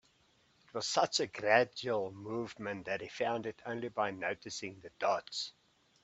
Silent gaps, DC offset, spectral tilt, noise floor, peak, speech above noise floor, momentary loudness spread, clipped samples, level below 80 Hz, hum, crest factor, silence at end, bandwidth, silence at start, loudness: none; under 0.1%; -3 dB/octave; -70 dBFS; -12 dBFS; 35 dB; 12 LU; under 0.1%; -76 dBFS; none; 24 dB; 0.55 s; 8.4 kHz; 0.75 s; -35 LUFS